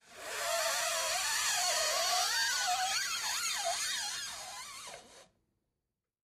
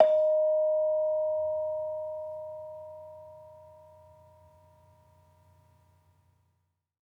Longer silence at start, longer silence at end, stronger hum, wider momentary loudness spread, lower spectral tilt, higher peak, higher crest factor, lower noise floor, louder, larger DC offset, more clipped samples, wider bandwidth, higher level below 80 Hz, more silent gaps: about the same, 0.1 s vs 0 s; second, 1 s vs 3.45 s; neither; second, 14 LU vs 23 LU; second, 2.5 dB/octave vs -6.5 dB/octave; second, -18 dBFS vs -6 dBFS; second, 16 dB vs 24 dB; first, -89 dBFS vs -77 dBFS; about the same, -31 LUFS vs -29 LUFS; neither; neither; first, 15.5 kHz vs 3.8 kHz; first, -72 dBFS vs -78 dBFS; neither